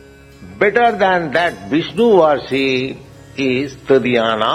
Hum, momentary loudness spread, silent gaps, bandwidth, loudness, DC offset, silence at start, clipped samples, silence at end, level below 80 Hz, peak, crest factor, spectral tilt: none; 9 LU; none; 12 kHz; -15 LUFS; under 0.1%; 0.4 s; under 0.1%; 0 s; -48 dBFS; 0 dBFS; 16 dB; -5.5 dB/octave